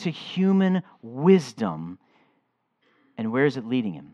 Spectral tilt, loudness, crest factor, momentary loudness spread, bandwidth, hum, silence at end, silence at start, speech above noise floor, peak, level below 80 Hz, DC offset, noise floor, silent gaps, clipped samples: -7.5 dB/octave; -24 LUFS; 20 dB; 17 LU; 7.6 kHz; none; 0.1 s; 0 s; 48 dB; -6 dBFS; -74 dBFS; under 0.1%; -72 dBFS; none; under 0.1%